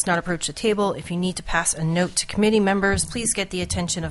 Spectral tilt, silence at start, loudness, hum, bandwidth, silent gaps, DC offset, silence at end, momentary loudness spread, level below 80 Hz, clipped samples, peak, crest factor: -4 dB/octave; 0 s; -22 LUFS; none; 11.5 kHz; none; under 0.1%; 0 s; 6 LU; -42 dBFS; under 0.1%; -6 dBFS; 16 dB